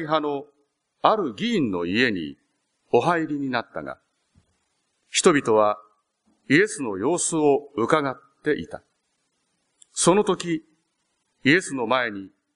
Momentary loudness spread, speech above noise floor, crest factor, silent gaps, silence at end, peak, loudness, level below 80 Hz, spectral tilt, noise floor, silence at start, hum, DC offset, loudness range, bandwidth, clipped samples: 14 LU; 51 dB; 22 dB; none; 0.3 s; -2 dBFS; -23 LUFS; -64 dBFS; -4 dB/octave; -73 dBFS; 0 s; none; under 0.1%; 4 LU; 10.5 kHz; under 0.1%